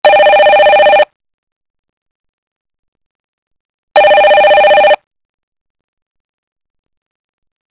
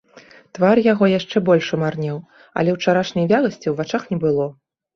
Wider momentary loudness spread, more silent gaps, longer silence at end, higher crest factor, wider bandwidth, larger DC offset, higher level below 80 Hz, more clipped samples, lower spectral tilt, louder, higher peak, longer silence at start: second, 6 LU vs 12 LU; first, 1.16-1.20 s, 1.34-1.61 s, 1.70-1.83 s, 1.89-2.65 s, 2.79-2.92 s, 3.06-3.51 s, 3.60-3.87 s vs none; first, 2.8 s vs 0.45 s; about the same, 12 dB vs 16 dB; second, 4 kHz vs 7.2 kHz; neither; first, -52 dBFS vs -58 dBFS; first, 0.3% vs under 0.1%; second, -5.5 dB/octave vs -7 dB/octave; first, -7 LUFS vs -19 LUFS; about the same, 0 dBFS vs -2 dBFS; second, 0.05 s vs 0.55 s